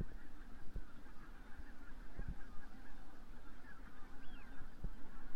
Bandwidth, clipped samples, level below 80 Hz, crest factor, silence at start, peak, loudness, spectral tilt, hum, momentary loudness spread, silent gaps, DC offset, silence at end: 5.8 kHz; under 0.1%; -52 dBFS; 12 dB; 0 s; -28 dBFS; -57 LUFS; -6.5 dB/octave; none; 8 LU; none; under 0.1%; 0 s